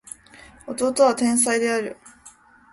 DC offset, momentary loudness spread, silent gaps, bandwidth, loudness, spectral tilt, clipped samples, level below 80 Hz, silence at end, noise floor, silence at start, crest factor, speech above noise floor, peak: under 0.1%; 22 LU; none; 12 kHz; -20 LUFS; -2.5 dB/octave; under 0.1%; -62 dBFS; 0.45 s; -50 dBFS; 0.65 s; 18 dB; 30 dB; -6 dBFS